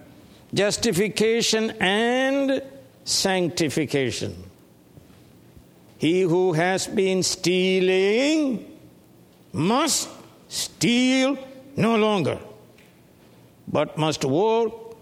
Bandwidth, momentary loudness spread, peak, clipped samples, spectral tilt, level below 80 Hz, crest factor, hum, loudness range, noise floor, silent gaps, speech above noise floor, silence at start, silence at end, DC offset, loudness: 16 kHz; 10 LU; -4 dBFS; under 0.1%; -4 dB/octave; -60 dBFS; 18 dB; none; 4 LU; -52 dBFS; none; 31 dB; 0.55 s; 0.1 s; under 0.1%; -22 LUFS